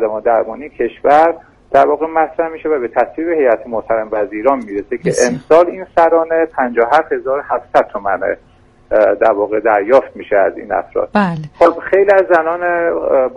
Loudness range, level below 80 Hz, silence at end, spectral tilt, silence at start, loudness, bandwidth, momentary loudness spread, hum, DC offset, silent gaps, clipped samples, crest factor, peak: 2 LU; -48 dBFS; 0 s; -5.5 dB/octave; 0 s; -14 LUFS; 11.5 kHz; 8 LU; none; under 0.1%; none; under 0.1%; 14 dB; 0 dBFS